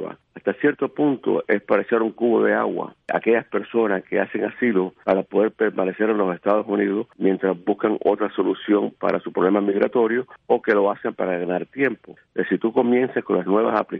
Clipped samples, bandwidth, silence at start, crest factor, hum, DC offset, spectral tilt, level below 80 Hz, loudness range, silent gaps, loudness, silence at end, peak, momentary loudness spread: under 0.1%; 4.8 kHz; 0 s; 16 dB; none; under 0.1%; -9.5 dB/octave; -68 dBFS; 1 LU; none; -21 LUFS; 0 s; -4 dBFS; 5 LU